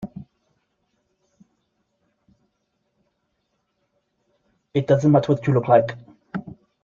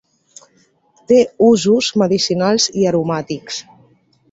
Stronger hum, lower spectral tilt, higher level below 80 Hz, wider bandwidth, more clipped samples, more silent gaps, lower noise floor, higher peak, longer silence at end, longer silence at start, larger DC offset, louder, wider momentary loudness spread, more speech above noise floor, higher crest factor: neither; first, -8.5 dB/octave vs -4.5 dB/octave; about the same, -62 dBFS vs -58 dBFS; second, 7.2 kHz vs 8 kHz; neither; neither; first, -73 dBFS vs -57 dBFS; about the same, -4 dBFS vs -2 dBFS; second, 0.3 s vs 0.7 s; second, 0 s vs 1.1 s; neither; second, -19 LUFS vs -15 LUFS; first, 20 LU vs 13 LU; first, 55 dB vs 42 dB; first, 22 dB vs 16 dB